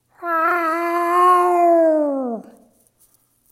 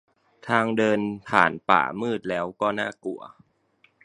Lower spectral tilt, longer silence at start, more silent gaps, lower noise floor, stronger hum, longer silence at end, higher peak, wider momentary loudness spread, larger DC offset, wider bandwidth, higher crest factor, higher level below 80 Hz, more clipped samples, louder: second, -4.5 dB/octave vs -6 dB/octave; second, 0.2 s vs 0.45 s; neither; second, -59 dBFS vs -64 dBFS; neither; first, 1.1 s vs 0.75 s; second, -4 dBFS vs 0 dBFS; second, 11 LU vs 14 LU; neither; first, 15.5 kHz vs 10.5 kHz; second, 14 dB vs 24 dB; second, -74 dBFS vs -64 dBFS; neither; first, -17 LUFS vs -24 LUFS